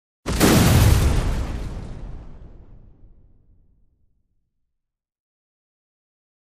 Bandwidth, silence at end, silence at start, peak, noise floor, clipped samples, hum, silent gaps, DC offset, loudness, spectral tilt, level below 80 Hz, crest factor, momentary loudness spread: 15.5 kHz; 3.75 s; 0.25 s; -4 dBFS; -80 dBFS; under 0.1%; none; none; under 0.1%; -19 LUFS; -5 dB/octave; -28 dBFS; 20 dB; 24 LU